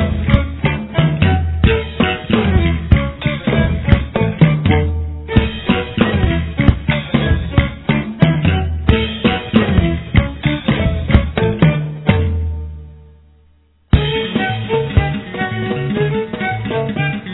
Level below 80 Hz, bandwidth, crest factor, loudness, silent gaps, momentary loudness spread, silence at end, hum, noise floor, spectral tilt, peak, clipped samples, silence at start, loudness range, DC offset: -24 dBFS; 4.1 kHz; 16 dB; -16 LUFS; none; 6 LU; 0 s; none; -52 dBFS; -10.5 dB/octave; 0 dBFS; 0.2%; 0 s; 3 LU; under 0.1%